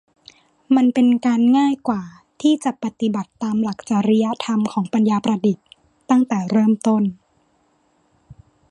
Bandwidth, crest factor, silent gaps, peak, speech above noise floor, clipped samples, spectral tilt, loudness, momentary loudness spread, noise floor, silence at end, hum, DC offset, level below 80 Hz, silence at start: 11 kHz; 16 dB; none; -4 dBFS; 44 dB; under 0.1%; -6.5 dB/octave; -19 LUFS; 9 LU; -62 dBFS; 0.4 s; none; under 0.1%; -62 dBFS; 0.7 s